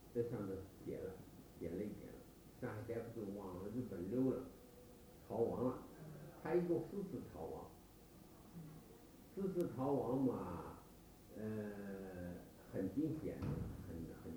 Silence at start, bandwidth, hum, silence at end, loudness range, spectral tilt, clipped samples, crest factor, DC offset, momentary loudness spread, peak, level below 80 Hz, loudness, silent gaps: 0 s; over 20 kHz; none; 0 s; 4 LU; -8 dB/octave; under 0.1%; 18 dB; under 0.1%; 21 LU; -26 dBFS; -64 dBFS; -45 LUFS; none